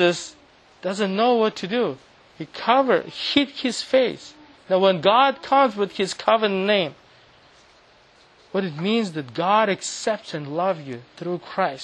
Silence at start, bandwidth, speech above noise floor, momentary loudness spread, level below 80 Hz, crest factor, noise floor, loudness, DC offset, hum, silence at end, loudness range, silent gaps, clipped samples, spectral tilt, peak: 0 s; 10.5 kHz; 32 dB; 12 LU; -66 dBFS; 20 dB; -54 dBFS; -22 LUFS; under 0.1%; none; 0 s; 5 LU; none; under 0.1%; -4.5 dB/octave; -2 dBFS